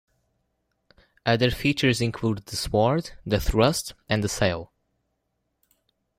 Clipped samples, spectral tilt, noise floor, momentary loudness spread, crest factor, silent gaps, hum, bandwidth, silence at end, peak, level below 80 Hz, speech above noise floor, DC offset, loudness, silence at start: under 0.1%; -5 dB/octave; -76 dBFS; 7 LU; 22 dB; none; 60 Hz at -50 dBFS; 16 kHz; 1.55 s; -4 dBFS; -40 dBFS; 53 dB; under 0.1%; -24 LUFS; 1.25 s